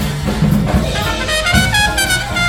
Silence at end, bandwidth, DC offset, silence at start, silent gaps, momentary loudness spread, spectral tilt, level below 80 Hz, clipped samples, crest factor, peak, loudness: 0 s; 18.5 kHz; under 0.1%; 0 s; none; 5 LU; -4 dB/octave; -24 dBFS; under 0.1%; 14 dB; 0 dBFS; -14 LUFS